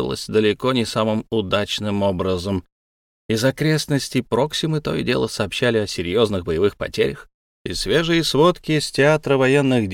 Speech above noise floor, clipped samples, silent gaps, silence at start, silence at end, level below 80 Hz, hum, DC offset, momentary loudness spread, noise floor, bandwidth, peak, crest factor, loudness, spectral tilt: over 71 dB; under 0.1%; 2.72-3.29 s, 7.34-7.65 s; 0 s; 0 s; -44 dBFS; none; under 0.1%; 6 LU; under -90 dBFS; 17 kHz; -4 dBFS; 16 dB; -20 LUFS; -5 dB/octave